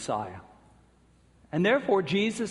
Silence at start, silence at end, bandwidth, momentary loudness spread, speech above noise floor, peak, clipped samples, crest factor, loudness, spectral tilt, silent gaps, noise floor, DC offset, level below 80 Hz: 0 s; 0 s; 11.5 kHz; 15 LU; 34 dB; -12 dBFS; under 0.1%; 18 dB; -27 LUFS; -5.5 dB/octave; none; -61 dBFS; under 0.1%; -64 dBFS